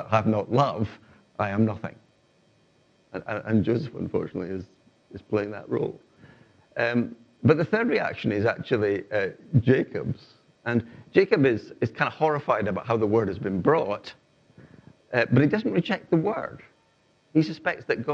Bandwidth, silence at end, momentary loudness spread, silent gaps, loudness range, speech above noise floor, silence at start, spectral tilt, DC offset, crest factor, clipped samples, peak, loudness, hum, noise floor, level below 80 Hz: 7.6 kHz; 0 s; 13 LU; none; 6 LU; 39 dB; 0 s; -8.5 dB/octave; under 0.1%; 22 dB; under 0.1%; -4 dBFS; -26 LUFS; none; -64 dBFS; -64 dBFS